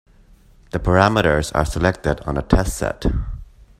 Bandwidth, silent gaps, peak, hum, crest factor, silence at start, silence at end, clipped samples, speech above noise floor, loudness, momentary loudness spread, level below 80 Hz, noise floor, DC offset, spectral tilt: 16 kHz; none; 0 dBFS; none; 20 dB; 0.75 s; 0.35 s; under 0.1%; 31 dB; -19 LUFS; 13 LU; -28 dBFS; -49 dBFS; under 0.1%; -6 dB/octave